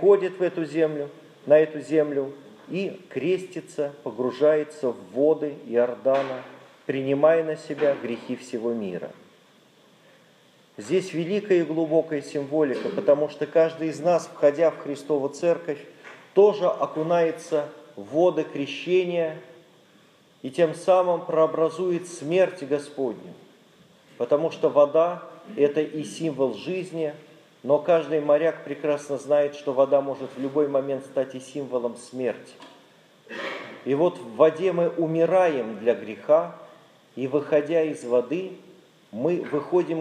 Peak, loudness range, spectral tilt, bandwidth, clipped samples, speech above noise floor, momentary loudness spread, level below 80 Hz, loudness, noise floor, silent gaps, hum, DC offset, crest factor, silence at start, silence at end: -4 dBFS; 4 LU; -6.5 dB/octave; 11 kHz; under 0.1%; 33 dB; 13 LU; -84 dBFS; -24 LUFS; -57 dBFS; none; none; under 0.1%; 20 dB; 0 s; 0 s